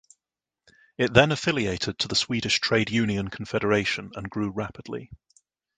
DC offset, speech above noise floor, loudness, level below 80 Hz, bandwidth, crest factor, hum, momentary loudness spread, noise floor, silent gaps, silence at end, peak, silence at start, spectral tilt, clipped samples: under 0.1%; 64 dB; -25 LUFS; -50 dBFS; 9.6 kHz; 26 dB; none; 14 LU; -89 dBFS; none; 0.6 s; 0 dBFS; 1 s; -4.5 dB/octave; under 0.1%